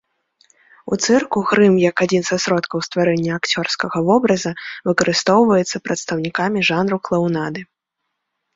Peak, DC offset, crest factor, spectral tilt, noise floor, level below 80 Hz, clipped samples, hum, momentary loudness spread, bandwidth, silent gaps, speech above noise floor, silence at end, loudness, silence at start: -2 dBFS; under 0.1%; 16 dB; -4.5 dB/octave; -77 dBFS; -58 dBFS; under 0.1%; none; 9 LU; 7.8 kHz; none; 59 dB; 0.9 s; -17 LUFS; 0.85 s